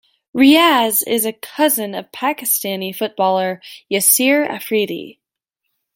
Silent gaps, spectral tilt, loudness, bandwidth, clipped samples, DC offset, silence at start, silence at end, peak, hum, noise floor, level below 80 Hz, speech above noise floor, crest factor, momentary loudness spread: none; -2.5 dB/octave; -16 LUFS; 17 kHz; under 0.1%; under 0.1%; 0.35 s; 0.85 s; 0 dBFS; none; -78 dBFS; -64 dBFS; 62 dB; 18 dB; 13 LU